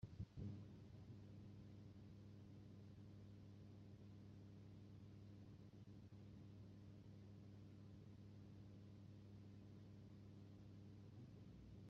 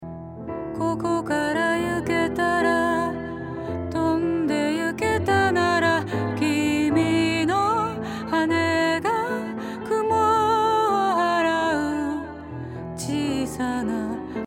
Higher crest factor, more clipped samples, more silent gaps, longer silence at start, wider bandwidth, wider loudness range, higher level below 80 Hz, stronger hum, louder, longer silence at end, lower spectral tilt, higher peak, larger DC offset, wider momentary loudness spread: about the same, 18 dB vs 16 dB; neither; neither; about the same, 0 s vs 0 s; second, 7.2 kHz vs 16 kHz; about the same, 2 LU vs 2 LU; second, -74 dBFS vs -54 dBFS; neither; second, -62 LUFS vs -23 LUFS; about the same, 0 s vs 0 s; first, -8.5 dB/octave vs -5.5 dB/octave; second, -42 dBFS vs -8 dBFS; neither; second, 2 LU vs 11 LU